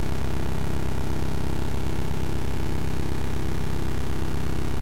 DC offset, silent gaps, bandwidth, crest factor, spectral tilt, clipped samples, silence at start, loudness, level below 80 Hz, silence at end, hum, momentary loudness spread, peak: 8%; none; 16 kHz; 14 dB; -6.5 dB/octave; under 0.1%; 0 s; -30 LUFS; -32 dBFS; 0 s; none; 1 LU; -18 dBFS